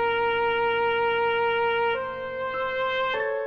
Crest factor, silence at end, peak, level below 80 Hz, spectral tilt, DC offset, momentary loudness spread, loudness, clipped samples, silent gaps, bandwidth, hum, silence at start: 10 dB; 0 s; -16 dBFS; -56 dBFS; -5 dB/octave; under 0.1%; 6 LU; -25 LUFS; under 0.1%; none; 6 kHz; none; 0 s